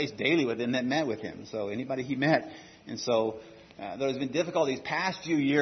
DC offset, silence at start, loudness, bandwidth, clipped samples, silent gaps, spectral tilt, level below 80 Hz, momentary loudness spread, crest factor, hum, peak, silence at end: under 0.1%; 0 s; -29 LUFS; 6.4 kHz; under 0.1%; none; -5 dB/octave; -70 dBFS; 15 LU; 20 dB; none; -10 dBFS; 0 s